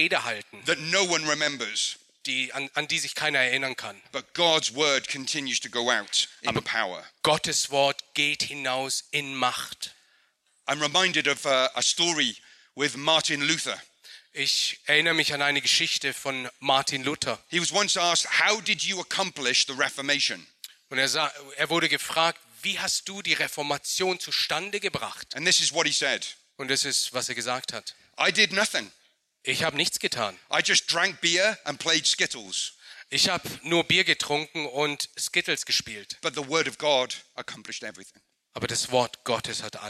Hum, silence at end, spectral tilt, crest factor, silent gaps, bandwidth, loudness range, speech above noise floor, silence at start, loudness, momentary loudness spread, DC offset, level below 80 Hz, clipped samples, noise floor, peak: none; 0 s; -1.5 dB/octave; 22 dB; none; 15.5 kHz; 3 LU; 41 dB; 0 s; -25 LUFS; 11 LU; under 0.1%; -68 dBFS; under 0.1%; -67 dBFS; -6 dBFS